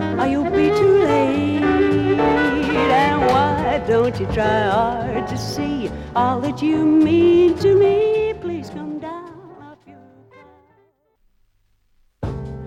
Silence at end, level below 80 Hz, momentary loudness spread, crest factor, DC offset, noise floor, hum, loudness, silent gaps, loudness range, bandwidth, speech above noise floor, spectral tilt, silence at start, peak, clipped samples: 0 s; -40 dBFS; 14 LU; 14 dB; under 0.1%; -61 dBFS; none; -17 LUFS; none; 16 LU; 12.5 kHz; 45 dB; -7 dB/octave; 0 s; -4 dBFS; under 0.1%